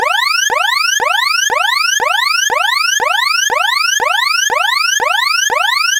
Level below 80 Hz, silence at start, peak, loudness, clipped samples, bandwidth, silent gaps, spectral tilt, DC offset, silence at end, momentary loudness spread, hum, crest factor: -58 dBFS; 0 s; -2 dBFS; -11 LUFS; under 0.1%; 17 kHz; none; 2.5 dB/octave; under 0.1%; 0 s; 1 LU; none; 10 dB